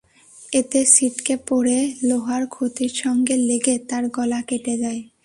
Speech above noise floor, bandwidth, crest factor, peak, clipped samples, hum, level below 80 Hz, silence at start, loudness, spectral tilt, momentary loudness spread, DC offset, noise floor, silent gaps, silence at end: 26 dB; 11.5 kHz; 20 dB; 0 dBFS; under 0.1%; none; -60 dBFS; 0.35 s; -20 LUFS; -2.5 dB/octave; 11 LU; under 0.1%; -47 dBFS; none; 0.2 s